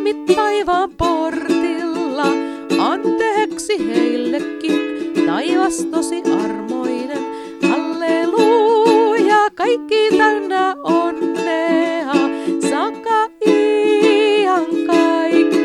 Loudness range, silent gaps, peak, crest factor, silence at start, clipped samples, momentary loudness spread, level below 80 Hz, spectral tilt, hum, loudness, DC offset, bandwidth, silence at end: 4 LU; none; 0 dBFS; 16 dB; 0 s; under 0.1%; 7 LU; -50 dBFS; -4.5 dB/octave; none; -16 LUFS; under 0.1%; 12.5 kHz; 0 s